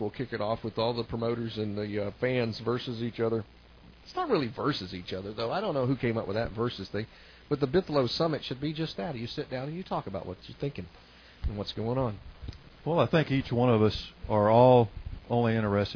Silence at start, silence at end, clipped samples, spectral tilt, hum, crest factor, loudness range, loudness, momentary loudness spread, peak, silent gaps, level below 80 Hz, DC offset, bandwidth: 0 s; 0 s; under 0.1%; -8 dB/octave; none; 20 dB; 10 LU; -29 LUFS; 13 LU; -8 dBFS; none; -48 dBFS; under 0.1%; 5.4 kHz